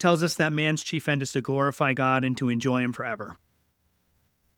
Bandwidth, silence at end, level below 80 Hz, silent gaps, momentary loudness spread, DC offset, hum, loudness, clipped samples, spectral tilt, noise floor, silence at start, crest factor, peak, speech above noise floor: 18.5 kHz; 1.25 s; -66 dBFS; none; 9 LU; under 0.1%; none; -25 LUFS; under 0.1%; -5.5 dB/octave; -70 dBFS; 0 s; 22 dB; -4 dBFS; 45 dB